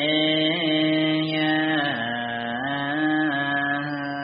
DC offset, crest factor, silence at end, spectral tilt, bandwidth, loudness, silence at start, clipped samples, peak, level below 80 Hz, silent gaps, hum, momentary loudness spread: under 0.1%; 14 dB; 0 s; -2.5 dB/octave; 5.2 kHz; -23 LUFS; 0 s; under 0.1%; -10 dBFS; -66 dBFS; none; none; 6 LU